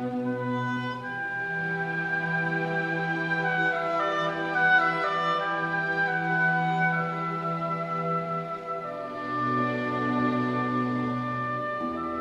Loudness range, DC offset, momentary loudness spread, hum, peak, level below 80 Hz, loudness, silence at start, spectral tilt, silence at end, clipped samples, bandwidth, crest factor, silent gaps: 4 LU; under 0.1%; 7 LU; none; -10 dBFS; -66 dBFS; -27 LUFS; 0 s; -7 dB/octave; 0 s; under 0.1%; 9.2 kHz; 16 dB; none